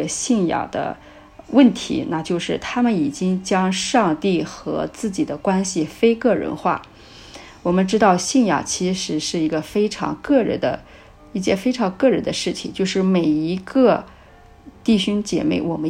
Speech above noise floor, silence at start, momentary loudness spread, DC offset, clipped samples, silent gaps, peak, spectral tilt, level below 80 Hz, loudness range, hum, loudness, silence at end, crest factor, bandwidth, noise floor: 27 dB; 0 s; 9 LU; under 0.1%; under 0.1%; none; -2 dBFS; -5 dB/octave; -50 dBFS; 2 LU; none; -20 LUFS; 0 s; 18 dB; 14 kHz; -46 dBFS